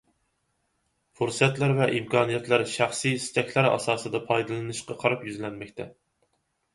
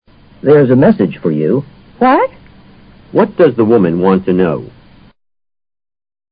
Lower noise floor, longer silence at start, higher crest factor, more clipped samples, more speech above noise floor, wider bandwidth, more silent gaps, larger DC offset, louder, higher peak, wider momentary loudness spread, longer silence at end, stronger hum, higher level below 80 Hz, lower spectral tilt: first, -74 dBFS vs -40 dBFS; first, 1.2 s vs 0.45 s; first, 22 dB vs 12 dB; neither; first, 48 dB vs 30 dB; first, 11.5 kHz vs 5 kHz; neither; neither; second, -26 LUFS vs -11 LUFS; second, -4 dBFS vs 0 dBFS; first, 12 LU vs 9 LU; second, 0.8 s vs 1.65 s; neither; second, -64 dBFS vs -46 dBFS; second, -5 dB/octave vs -12.5 dB/octave